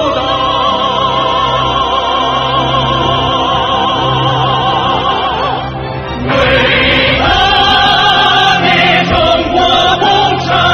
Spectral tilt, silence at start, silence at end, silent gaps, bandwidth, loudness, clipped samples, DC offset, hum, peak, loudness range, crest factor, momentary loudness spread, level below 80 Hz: -4.5 dB/octave; 0 s; 0 s; none; 9.4 kHz; -10 LUFS; under 0.1%; under 0.1%; none; 0 dBFS; 4 LU; 10 dB; 6 LU; -28 dBFS